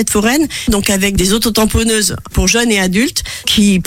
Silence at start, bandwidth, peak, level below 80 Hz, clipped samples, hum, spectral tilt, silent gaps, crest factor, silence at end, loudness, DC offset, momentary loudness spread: 0 s; 16.5 kHz; 0 dBFS; -26 dBFS; under 0.1%; none; -3.5 dB/octave; none; 12 dB; 0 s; -12 LUFS; under 0.1%; 4 LU